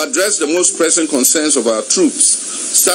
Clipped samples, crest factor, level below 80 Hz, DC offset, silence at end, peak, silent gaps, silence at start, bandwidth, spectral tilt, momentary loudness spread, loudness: under 0.1%; 14 dB; -74 dBFS; under 0.1%; 0 s; 0 dBFS; none; 0 s; over 20 kHz; -0.5 dB/octave; 3 LU; -12 LUFS